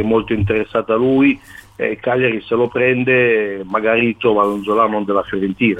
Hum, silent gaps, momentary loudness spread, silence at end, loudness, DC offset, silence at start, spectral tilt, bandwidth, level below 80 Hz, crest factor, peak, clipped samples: none; none; 7 LU; 0 s; -16 LUFS; under 0.1%; 0 s; -8 dB/octave; 11 kHz; -46 dBFS; 14 dB; -2 dBFS; under 0.1%